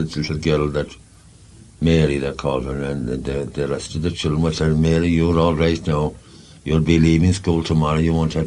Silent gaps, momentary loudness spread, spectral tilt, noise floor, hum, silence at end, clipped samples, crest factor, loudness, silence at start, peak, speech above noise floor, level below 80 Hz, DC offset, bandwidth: none; 8 LU; -7 dB/octave; -46 dBFS; none; 0 s; under 0.1%; 18 dB; -19 LUFS; 0 s; -2 dBFS; 28 dB; -32 dBFS; under 0.1%; 10.5 kHz